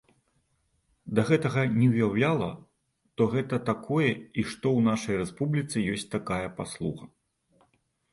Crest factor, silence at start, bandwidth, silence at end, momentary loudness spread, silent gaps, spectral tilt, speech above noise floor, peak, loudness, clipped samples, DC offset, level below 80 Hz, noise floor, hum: 20 dB; 1.05 s; 11.5 kHz; 1.05 s; 11 LU; none; -6.5 dB/octave; 46 dB; -8 dBFS; -28 LUFS; under 0.1%; under 0.1%; -58 dBFS; -73 dBFS; none